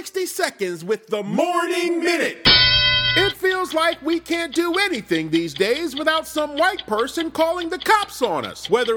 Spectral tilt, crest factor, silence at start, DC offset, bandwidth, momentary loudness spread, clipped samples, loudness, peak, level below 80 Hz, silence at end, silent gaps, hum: -3.5 dB/octave; 18 dB; 0 s; under 0.1%; 19.5 kHz; 10 LU; under 0.1%; -19 LUFS; -2 dBFS; -44 dBFS; 0 s; none; none